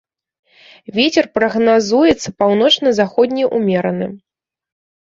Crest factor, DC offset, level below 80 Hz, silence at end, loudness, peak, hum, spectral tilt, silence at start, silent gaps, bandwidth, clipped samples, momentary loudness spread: 16 dB; under 0.1%; -50 dBFS; 0.9 s; -14 LUFS; 0 dBFS; none; -4.5 dB/octave; 0.95 s; none; 7.8 kHz; under 0.1%; 8 LU